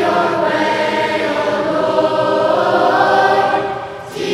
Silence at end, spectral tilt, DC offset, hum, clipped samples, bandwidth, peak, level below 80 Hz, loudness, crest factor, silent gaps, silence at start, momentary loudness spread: 0 s; -5 dB/octave; under 0.1%; none; under 0.1%; 13.5 kHz; 0 dBFS; -54 dBFS; -15 LUFS; 14 dB; none; 0 s; 7 LU